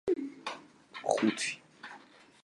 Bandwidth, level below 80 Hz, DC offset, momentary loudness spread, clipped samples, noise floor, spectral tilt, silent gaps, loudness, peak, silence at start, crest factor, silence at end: 11.5 kHz; -74 dBFS; under 0.1%; 19 LU; under 0.1%; -56 dBFS; -3.5 dB/octave; none; -34 LUFS; -12 dBFS; 0.05 s; 24 dB; 0.45 s